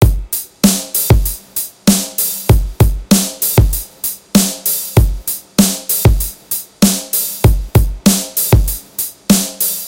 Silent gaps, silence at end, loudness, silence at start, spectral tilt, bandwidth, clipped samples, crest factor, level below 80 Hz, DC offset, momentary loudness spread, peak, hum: none; 0 s; -14 LUFS; 0 s; -4.5 dB/octave; 17.5 kHz; under 0.1%; 14 dB; -20 dBFS; under 0.1%; 8 LU; 0 dBFS; none